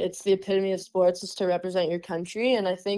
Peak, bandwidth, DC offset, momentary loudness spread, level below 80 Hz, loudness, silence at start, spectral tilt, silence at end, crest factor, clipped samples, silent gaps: -12 dBFS; 12.5 kHz; under 0.1%; 5 LU; -68 dBFS; -26 LUFS; 0 s; -5 dB/octave; 0 s; 14 dB; under 0.1%; none